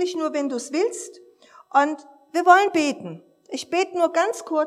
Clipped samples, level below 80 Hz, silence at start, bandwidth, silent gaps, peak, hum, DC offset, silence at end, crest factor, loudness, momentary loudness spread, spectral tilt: under 0.1%; -80 dBFS; 0 s; 14 kHz; none; -2 dBFS; none; under 0.1%; 0 s; 20 dB; -21 LUFS; 19 LU; -3 dB/octave